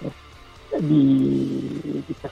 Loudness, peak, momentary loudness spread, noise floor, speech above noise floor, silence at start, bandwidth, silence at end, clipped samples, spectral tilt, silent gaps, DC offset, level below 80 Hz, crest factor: -22 LUFS; -8 dBFS; 13 LU; -45 dBFS; 25 dB; 0 s; 7.4 kHz; 0 s; under 0.1%; -9 dB/octave; none; under 0.1%; -52 dBFS; 14 dB